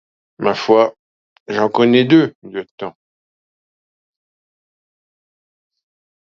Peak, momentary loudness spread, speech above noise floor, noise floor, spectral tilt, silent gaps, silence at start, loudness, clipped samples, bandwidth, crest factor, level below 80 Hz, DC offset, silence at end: 0 dBFS; 18 LU; over 76 dB; under -90 dBFS; -6.5 dB/octave; 0.99-1.46 s, 2.35-2.42 s, 2.71-2.78 s; 0.4 s; -15 LUFS; under 0.1%; 7 kHz; 20 dB; -66 dBFS; under 0.1%; 3.4 s